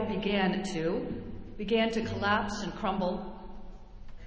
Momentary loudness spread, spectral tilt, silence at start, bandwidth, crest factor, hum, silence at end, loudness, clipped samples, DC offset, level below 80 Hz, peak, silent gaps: 16 LU; -5.5 dB/octave; 0 s; 8 kHz; 20 dB; none; 0 s; -31 LUFS; under 0.1%; under 0.1%; -48 dBFS; -12 dBFS; none